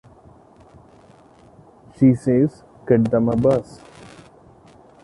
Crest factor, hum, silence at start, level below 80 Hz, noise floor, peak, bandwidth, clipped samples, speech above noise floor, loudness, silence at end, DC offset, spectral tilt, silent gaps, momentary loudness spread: 20 dB; none; 2 s; -50 dBFS; -49 dBFS; -2 dBFS; 11 kHz; under 0.1%; 32 dB; -18 LUFS; 1.3 s; under 0.1%; -9.5 dB/octave; none; 9 LU